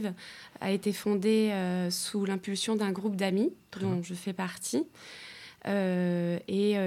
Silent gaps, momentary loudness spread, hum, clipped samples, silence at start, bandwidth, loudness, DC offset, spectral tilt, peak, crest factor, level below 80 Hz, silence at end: none; 13 LU; none; under 0.1%; 0 s; 15.5 kHz; -31 LUFS; under 0.1%; -5.5 dB/octave; -16 dBFS; 16 dB; -74 dBFS; 0 s